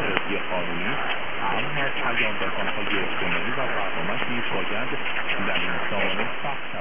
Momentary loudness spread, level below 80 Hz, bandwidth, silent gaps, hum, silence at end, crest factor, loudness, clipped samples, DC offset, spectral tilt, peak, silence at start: 3 LU; -58 dBFS; 3.7 kHz; none; none; 0 s; 24 dB; -25 LUFS; under 0.1%; 6%; -7.5 dB/octave; -2 dBFS; 0 s